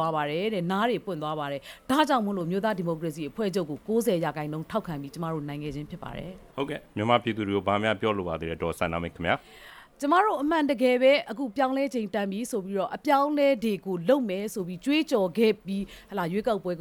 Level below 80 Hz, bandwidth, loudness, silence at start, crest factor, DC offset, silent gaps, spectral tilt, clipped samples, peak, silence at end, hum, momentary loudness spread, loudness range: -56 dBFS; 19 kHz; -27 LUFS; 0 s; 20 dB; under 0.1%; none; -6 dB/octave; under 0.1%; -8 dBFS; 0 s; none; 11 LU; 5 LU